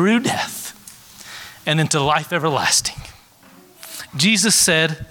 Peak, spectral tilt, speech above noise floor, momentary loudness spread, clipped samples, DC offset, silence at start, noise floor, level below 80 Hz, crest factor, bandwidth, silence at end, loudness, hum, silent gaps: -2 dBFS; -3 dB/octave; 30 dB; 22 LU; under 0.1%; under 0.1%; 0 s; -48 dBFS; -50 dBFS; 18 dB; 19 kHz; 0.05 s; -17 LUFS; none; none